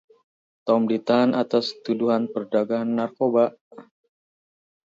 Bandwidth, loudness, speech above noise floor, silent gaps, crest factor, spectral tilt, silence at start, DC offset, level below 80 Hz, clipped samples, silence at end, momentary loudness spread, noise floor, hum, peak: 7.6 kHz; -23 LUFS; over 68 dB; 3.61-3.71 s; 18 dB; -7 dB/octave; 0.65 s; under 0.1%; -72 dBFS; under 0.1%; 1.05 s; 5 LU; under -90 dBFS; none; -6 dBFS